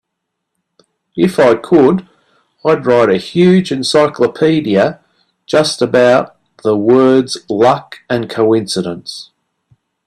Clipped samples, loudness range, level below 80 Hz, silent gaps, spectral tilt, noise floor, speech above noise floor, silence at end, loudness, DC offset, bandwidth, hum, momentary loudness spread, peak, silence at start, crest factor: under 0.1%; 2 LU; -54 dBFS; none; -6 dB/octave; -74 dBFS; 63 dB; 0.85 s; -12 LUFS; under 0.1%; 13 kHz; none; 10 LU; 0 dBFS; 1.15 s; 14 dB